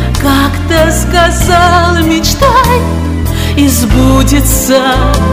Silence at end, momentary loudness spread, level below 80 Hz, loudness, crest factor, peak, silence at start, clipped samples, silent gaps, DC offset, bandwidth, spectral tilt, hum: 0 s; 4 LU; -14 dBFS; -8 LUFS; 8 dB; 0 dBFS; 0 s; 3%; none; under 0.1%; 16.5 kHz; -4.5 dB/octave; none